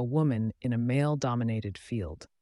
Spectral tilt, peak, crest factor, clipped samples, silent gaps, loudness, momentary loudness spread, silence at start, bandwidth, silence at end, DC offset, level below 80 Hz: -7.5 dB/octave; -16 dBFS; 14 dB; under 0.1%; none; -30 LUFS; 8 LU; 0 s; 11.5 kHz; 0.15 s; under 0.1%; -54 dBFS